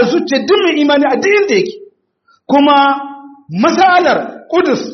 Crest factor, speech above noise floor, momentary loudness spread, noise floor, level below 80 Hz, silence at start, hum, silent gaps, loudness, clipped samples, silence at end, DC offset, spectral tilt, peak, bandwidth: 12 dB; 44 dB; 9 LU; -55 dBFS; -60 dBFS; 0 s; none; none; -11 LUFS; under 0.1%; 0 s; under 0.1%; -2.5 dB/octave; 0 dBFS; 6.4 kHz